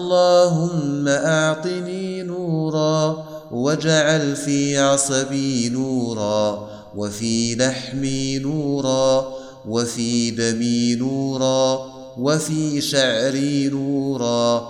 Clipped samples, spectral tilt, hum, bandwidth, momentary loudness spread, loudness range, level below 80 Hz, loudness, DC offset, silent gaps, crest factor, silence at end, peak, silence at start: under 0.1%; -4.5 dB/octave; none; 15.5 kHz; 9 LU; 3 LU; -54 dBFS; -20 LUFS; under 0.1%; none; 16 dB; 0 s; -4 dBFS; 0 s